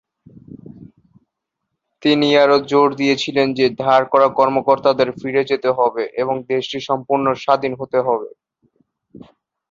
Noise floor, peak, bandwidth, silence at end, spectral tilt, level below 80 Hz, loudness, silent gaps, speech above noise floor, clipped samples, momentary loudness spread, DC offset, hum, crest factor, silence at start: -78 dBFS; -2 dBFS; 7.6 kHz; 1.45 s; -5.5 dB/octave; -60 dBFS; -17 LUFS; none; 61 dB; under 0.1%; 8 LU; under 0.1%; none; 16 dB; 0.5 s